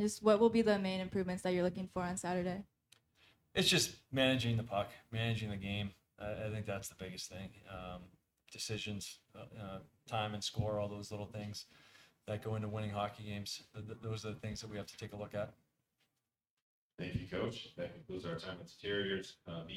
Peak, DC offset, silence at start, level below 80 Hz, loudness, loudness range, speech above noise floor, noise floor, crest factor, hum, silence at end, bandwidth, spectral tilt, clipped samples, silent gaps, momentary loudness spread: -16 dBFS; under 0.1%; 0 s; -64 dBFS; -39 LUFS; 10 LU; 51 dB; -90 dBFS; 24 dB; none; 0 s; 16.5 kHz; -4.5 dB/octave; under 0.1%; 16.50-16.90 s; 16 LU